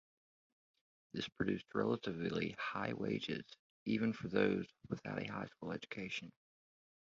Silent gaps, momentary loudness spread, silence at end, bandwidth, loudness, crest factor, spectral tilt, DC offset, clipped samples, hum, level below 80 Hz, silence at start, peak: 3.59-3.86 s; 10 LU; 0.7 s; 7.6 kHz; -41 LUFS; 24 dB; -4.5 dB/octave; under 0.1%; under 0.1%; none; -70 dBFS; 1.15 s; -18 dBFS